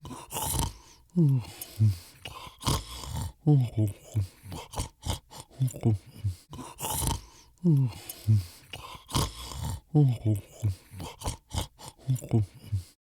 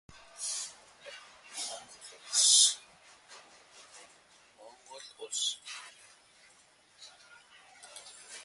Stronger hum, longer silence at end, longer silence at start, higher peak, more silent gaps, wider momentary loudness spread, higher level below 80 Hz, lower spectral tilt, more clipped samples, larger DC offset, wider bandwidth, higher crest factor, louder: neither; first, 0.2 s vs 0 s; second, 0.05 s vs 0.35 s; about the same, -8 dBFS vs -10 dBFS; neither; second, 16 LU vs 31 LU; first, -46 dBFS vs -80 dBFS; first, -6 dB/octave vs 3.5 dB/octave; neither; neither; first, over 20 kHz vs 12 kHz; about the same, 22 dB vs 26 dB; about the same, -30 LUFS vs -28 LUFS